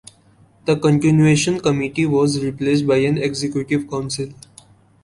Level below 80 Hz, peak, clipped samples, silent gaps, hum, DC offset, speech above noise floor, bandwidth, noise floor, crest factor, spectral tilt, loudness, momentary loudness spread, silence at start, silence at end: -50 dBFS; -4 dBFS; under 0.1%; none; none; under 0.1%; 35 dB; 11.5 kHz; -52 dBFS; 14 dB; -6 dB/octave; -18 LUFS; 11 LU; 0.65 s; 0.7 s